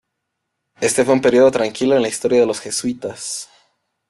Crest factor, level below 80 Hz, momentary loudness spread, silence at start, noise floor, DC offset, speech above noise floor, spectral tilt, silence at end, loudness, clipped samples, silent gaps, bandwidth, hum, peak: 16 dB; -58 dBFS; 13 LU; 0.8 s; -76 dBFS; under 0.1%; 60 dB; -4 dB/octave; 0.65 s; -17 LUFS; under 0.1%; none; 12.5 kHz; none; -4 dBFS